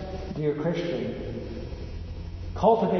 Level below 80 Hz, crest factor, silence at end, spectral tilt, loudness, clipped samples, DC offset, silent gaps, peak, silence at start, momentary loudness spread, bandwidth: -40 dBFS; 20 dB; 0 s; -8 dB/octave; -30 LUFS; under 0.1%; under 0.1%; none; -8 dBFS; 0 s; 15 LU; 6.4 kHz